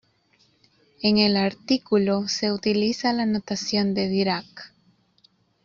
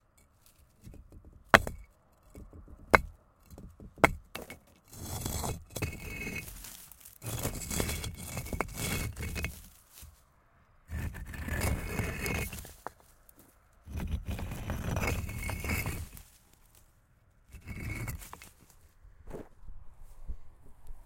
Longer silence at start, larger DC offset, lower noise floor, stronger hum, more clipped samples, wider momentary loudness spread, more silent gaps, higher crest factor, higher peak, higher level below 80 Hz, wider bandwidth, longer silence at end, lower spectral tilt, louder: first, 1 s vs 0.85 s; neither; about the same, -63 dBFS vs -65 dBFS; neither; neither; second, 6 LU vs 25 LU; neither; second, 18 dB vs 36 dB; second, -6 dBFS vs 0 dBFS; second, -62 dBFS vs -46 dBFS; second, 7.4 kHz vs 17 kHz; first, 1 s vs 0 s; about the same, -5 dB/octave vs -4 dB/octave; first, -23 LUFS vs -34 LUFS